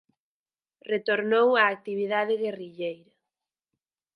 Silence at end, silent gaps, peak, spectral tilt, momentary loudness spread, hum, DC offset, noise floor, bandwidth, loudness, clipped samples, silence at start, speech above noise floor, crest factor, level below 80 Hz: 1.2 s; none; -6 dBFS; -6.5 dB/octave; 14 LU; none; under 0.1%; under -90 dBFS; 5.2 kHz; -26 LUFS; under 0.1%; 0.85 s; over 65 dB; 22 dB; -84 dBFS